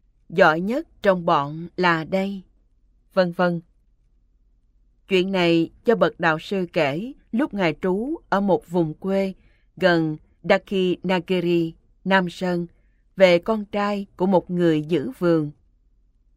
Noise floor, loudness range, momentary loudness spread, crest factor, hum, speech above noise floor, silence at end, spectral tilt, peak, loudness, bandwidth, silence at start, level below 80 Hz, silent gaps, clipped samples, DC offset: -60 dBFS; 3 LU; 10 LU; 20 dB; none; 39 dB; 0.85 s; -7 dB/octave; -2 dBFS; -22 LUFS; 14.5 kHz; 0.3 s; -56 dBFS; none; under 0.1%; under 0.1%